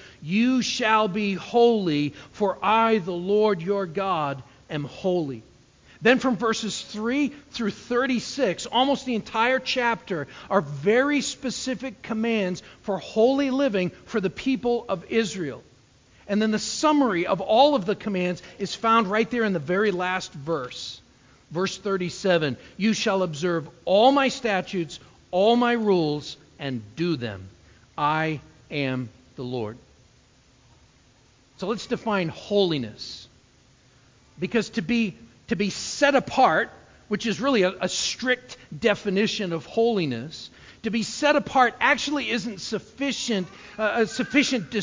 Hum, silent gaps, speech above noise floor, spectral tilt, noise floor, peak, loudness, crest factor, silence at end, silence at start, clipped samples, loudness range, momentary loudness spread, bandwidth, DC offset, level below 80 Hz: none; none; 34 dB; -4.5 dB/octave; -58 dBFS; -4 dBFS; -24 LUFS; 22 dB; 0 s; 0 s; under 0.1%; 6 LU; 12 LU; 7.6 kHz; under 0.1%; -60 dBFS